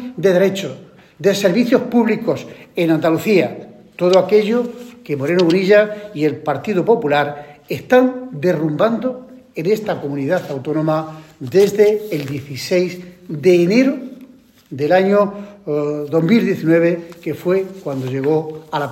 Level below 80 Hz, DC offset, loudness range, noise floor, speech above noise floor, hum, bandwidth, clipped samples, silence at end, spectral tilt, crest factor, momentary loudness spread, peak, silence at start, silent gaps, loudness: -62 dBFS; under 0.1%; 2 LU; -44 dBFS; 28 dB; none; 16.5 kHz; under 0.1%; 0 s; -6.5 dB/octave; 16 dB; 14 LU; 0 dBFS; 0 s; none; -17 LUFS